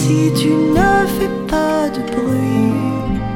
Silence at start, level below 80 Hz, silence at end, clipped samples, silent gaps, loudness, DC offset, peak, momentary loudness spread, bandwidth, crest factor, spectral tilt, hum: 0 s; -32 dBFS; 0 s; under 0.1%; none; -16 LUFS; under 0.1%; -2 dBFS; 6 LU; 17 kHz; 14 dB; -6 dB/octave; none